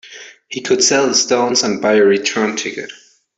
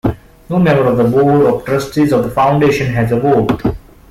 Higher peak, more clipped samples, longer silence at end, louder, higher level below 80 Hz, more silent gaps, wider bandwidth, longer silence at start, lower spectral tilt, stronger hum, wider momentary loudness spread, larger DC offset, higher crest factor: about the same, 0 dBFS vs -2 dBFS; neither; first, 0.45 s vs 0.3 s; about the same, -14 LUFS vs -13 LUFS; second, -60 dBFS vs -36 dBFS; neither; second, 8.4 kHz vs 15.5 kHz; about the same, 0.05 s vs 0.05 s; second, -2 dB/octave vs -7.5 dB/octave; neither; first, 16 LU vs 9 LU; neither; first, 16 dB vs 10 dB